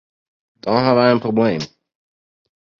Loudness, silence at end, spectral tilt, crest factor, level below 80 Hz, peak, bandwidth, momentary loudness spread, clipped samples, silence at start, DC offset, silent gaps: -17 LUFS; 1.15 s; -7 dB/octave; 20 dB; -58 dBFS; 0 dBFS; 7.2 kHz; 15 LU; under 0.1%; 0.65 s; under 0.1%; none